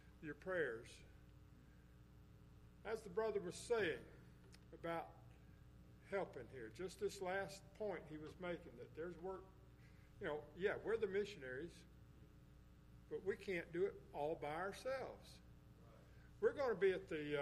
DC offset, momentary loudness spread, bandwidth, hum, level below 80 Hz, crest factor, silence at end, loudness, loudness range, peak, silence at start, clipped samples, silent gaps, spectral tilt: under 0.1%; 23 LU; 14.5 kHz; none; -68 dBFS; 20 dB; 0 s; -46 LUFS; 4 LU; -28 dBFS; 0 s; under 0.1%; none; -5.5 dB/octave